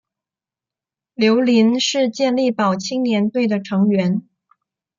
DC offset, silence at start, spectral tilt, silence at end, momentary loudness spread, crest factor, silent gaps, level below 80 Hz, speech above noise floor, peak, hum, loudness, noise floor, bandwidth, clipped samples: under 0.1%; 1.2 s; -5.5 dB/octave; 0.8 s; 6 LU; 16 dB; none; -68 dBFS; 72 dB; -4 dBFS; none; -18 LUFS; -89 dBFS; 7.6 kHz; under 0.1%